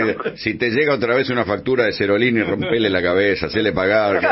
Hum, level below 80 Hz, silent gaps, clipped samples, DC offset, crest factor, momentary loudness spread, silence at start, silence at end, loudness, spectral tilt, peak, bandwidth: none; -48 dBFS; none; under 0.1%; under 0.1%; 14 dB; 4 LU; 0 s; 0 s; -18 LUFS; -3.5 dB/octave; -2 dBFS; 5.8 kHz